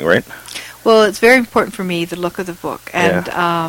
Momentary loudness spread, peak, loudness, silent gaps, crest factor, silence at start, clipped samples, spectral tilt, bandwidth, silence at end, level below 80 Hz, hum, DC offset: 15 LU; 0 dBFS; -15 LUFS; none; 16 dB; 0 s; under 0.1%; -4.5 dB/octave; 17 kHz; 0 s; -48 dBFS; none; under 0.1%